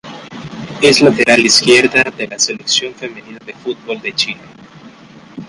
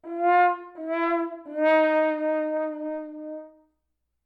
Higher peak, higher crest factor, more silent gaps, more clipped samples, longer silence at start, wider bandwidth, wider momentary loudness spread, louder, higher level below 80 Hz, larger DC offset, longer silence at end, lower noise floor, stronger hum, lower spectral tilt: first, 0 dBFS vs -10 dBFS; about the same, 14 dB vs 16 dB; neither; neither; about the same, 0.05 s vs 0.05 s; first, 11.5 kHz vs 5.2 kHz; first, 22 LU vs 16 LU; first, -11 LUFS vs -24 LUFS; first, -52 dBFS vs -80 dBFS; neither; second, 0 s vs 0.75 s; second, -39 dBFS vs -78 dBFS; neither; second, -2.5 dB/octave vs -4.5 dB/octave